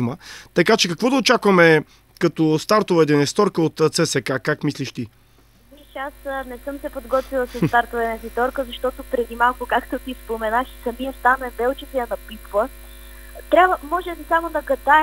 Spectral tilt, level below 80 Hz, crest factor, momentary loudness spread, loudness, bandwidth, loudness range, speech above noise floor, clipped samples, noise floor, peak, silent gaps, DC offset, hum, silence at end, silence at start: -4.5 dB/octave; -44 dBFS; 20 dB; 14 LU; -20 LUFS; 16 kHz; 8 LU; 33 dB; under 0.1%; -53 dBFS; 0 dBFS; none; under 0.1%; none; 0 s; 0 s